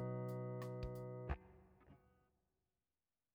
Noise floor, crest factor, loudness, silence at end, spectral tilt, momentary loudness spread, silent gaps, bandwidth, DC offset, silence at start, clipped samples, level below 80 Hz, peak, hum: under -90 dBFS; 20 dB; -48 LUFS; 1.35 s; -8.5 dB/octave; 22 LU; none; 17 kHz; under 0.1%; 0 s; under 0.1%; -60 dBFS; -30 dBFS; none